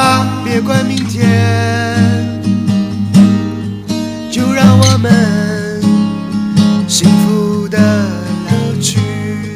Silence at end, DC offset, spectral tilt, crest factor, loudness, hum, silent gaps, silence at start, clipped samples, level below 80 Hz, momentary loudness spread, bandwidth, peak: 0 s; under 0.1%; -5.5 dB/octave; 12 dB; -12 LUFS; none; none; 0 s; 0.4%; -44 dBFS; 9 LU; 16 kHz; 0 dBFS